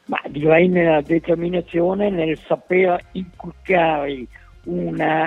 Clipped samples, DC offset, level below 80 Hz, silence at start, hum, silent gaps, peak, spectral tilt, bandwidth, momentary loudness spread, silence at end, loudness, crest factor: under 0.1%; under 0.1%; -48 dBFS; 0.1 s; none; none; 0 dBFS; -8.5 dB/octave; 4.9 kHz; 17 LU; 0 s; -19 LUFS; 18 dB